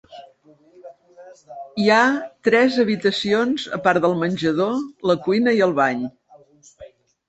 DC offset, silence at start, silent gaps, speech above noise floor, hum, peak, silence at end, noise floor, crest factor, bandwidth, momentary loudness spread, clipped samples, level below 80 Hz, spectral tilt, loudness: under 0.1%; 0.1 s; none; 34 dB; none; -2 dBFS; 0.4 s; -53 dBFS; 18 dB; 8.4 kHz; 8 LU; under 0.1%; -62 dBFS; -5.5 dB/octave; -19 LUFS